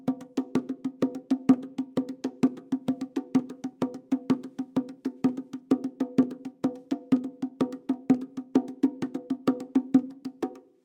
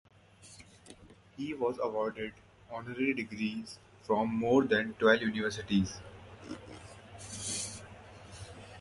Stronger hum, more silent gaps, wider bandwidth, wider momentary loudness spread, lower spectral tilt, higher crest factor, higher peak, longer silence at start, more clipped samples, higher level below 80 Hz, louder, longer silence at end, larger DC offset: neither; neither; second, 9.2 kHz vs 11.5 kHz; second, 9 LU vs 24 LU; first, -7.5 dB/octave vs -4.5 dB/octave; about the same, 20 dB vs 22 dB; first, -8 dBFS vs -12 dBFS; second, 0.05 s vs 0.4 s; neither; second, -74 dBFS vs -60 dBFS; first, -29 LUFS vs -32 LUFS; first, 0.25 s vs 0 s; neither